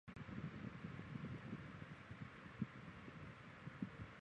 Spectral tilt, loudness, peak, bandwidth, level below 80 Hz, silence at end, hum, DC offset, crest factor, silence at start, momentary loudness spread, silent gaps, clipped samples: -7.5 dB/octave; -53 LUFS; -30 dBFS; 9.8 kHz; -68 dBFS; 0 s; none; under 0.1%; 22 dB; 0.05 s; 5 LU; none; under 0.1%